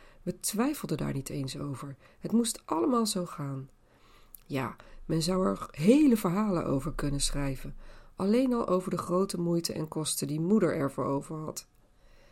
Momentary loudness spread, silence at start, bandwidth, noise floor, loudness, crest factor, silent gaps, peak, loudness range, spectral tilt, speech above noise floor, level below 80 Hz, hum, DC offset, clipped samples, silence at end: 13 LU; 0.25 s; 16.5 kHz; -58 dBFS; -30 LUFS; 20 dB; none; -10 dBFS; 4 LU; -5.5 dB/octave; 29 dB; -46 dBFS; none; under 0.1%; under 0.1%; 0.7 s